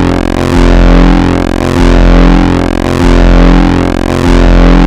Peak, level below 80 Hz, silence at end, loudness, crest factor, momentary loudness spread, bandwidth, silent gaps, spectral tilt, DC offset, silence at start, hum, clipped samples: 0 dBFS; -8 dBFS; 0 s; -7 LUFS; 4 dB; 4 LU; 9.6 kHz; none; -7 dB/octave; under 0.1%; 0 s; none; 2%